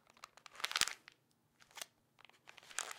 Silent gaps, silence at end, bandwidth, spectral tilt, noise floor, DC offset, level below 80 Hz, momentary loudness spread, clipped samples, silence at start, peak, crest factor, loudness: none; 0 s; 17 kHz; 2 dB/octave; -75 dBFS; under 0.1%; -80 dBFS; 24 LU; under 0.1%; 0.2 s; -8 dBFS; 38 dB; -40 LUFS